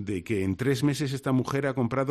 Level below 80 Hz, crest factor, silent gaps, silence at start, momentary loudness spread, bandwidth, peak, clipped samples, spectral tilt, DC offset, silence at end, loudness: -60 dBFS; 14 dB; none; 0 s; 3 LU; 14 kHz; -12 dBFS; under 0.1%; -6.5 dB/octave; under 0.1%; 0 s; -27 LUFS